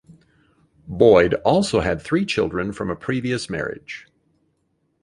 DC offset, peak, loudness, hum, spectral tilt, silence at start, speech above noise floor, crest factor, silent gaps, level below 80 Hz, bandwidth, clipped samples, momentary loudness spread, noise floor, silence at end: under 0.1%; -2 dBFS; -20 LUFS; none; -6 dB/octave; 0.1 s; 49 dB; 20 dB; none; -46 dBFS; 11.5 kHz; under 0.1%; 18 LU; -69 dBFS; 1.05 s